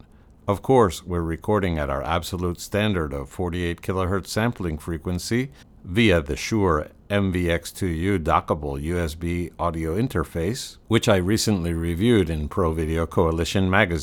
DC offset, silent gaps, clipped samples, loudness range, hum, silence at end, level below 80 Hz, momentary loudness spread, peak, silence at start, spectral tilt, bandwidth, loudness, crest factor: under 0.1%; none; under 0.1%; 3 LU; none; 0 s; -40 dBFS; 8 LU; -2 dBFS; 0.45 s; -5.5 dB/octave; 19.5 kHz; -23 LUFS; 20 dB